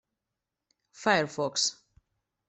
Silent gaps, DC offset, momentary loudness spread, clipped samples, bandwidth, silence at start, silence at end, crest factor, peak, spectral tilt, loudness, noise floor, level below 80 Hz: none; under 0.1%; 4 LU; under 0.1%; 8.4 kHz; 1 s; 0.75 s; 24 dB; -10 dBFS; -2 dB/octave; -28 LUFS; -87 dBFS; -74 dBFS